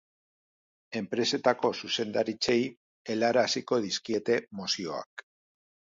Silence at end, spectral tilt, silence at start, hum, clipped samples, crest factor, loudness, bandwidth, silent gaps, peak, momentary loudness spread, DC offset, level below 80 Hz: 0.65 s; -3.5 dB/octave; 0.9 s; none; under 0.1%; 20 dB; -29 LUFS; 7.8 kHz; 2.77-3.05 s, 5.06-5.17 s; -10 dBFS; 12 LU; under 0.1%; -72 dBFS